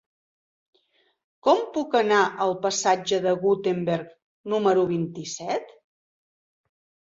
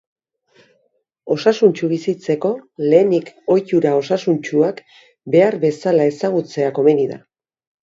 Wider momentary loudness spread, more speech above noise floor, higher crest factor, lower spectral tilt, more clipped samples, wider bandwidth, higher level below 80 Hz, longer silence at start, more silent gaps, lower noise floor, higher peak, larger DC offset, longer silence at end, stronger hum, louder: first, 10 LU vs 7 LU; second, 44 dB vs 49 dB; about the same, 20 dB vs 18 dB; second, -4.5 dB/octave vs -7 dB/octave; neither; about the same, 7.8 kHz vs 7.8 kHz; about the same, -70 dBFS vs -68 dBFS; first, 1.45 s vs 1.25 s; first, 4.22-4.44 s vs none; about the same, -67 dBFS vs -66 dBFS; second, -6 dBFS vs 0 dBFS; neither; first, 1.4 s vs 0.65 s; neither; second, -24 LUFS vs -17 LUFS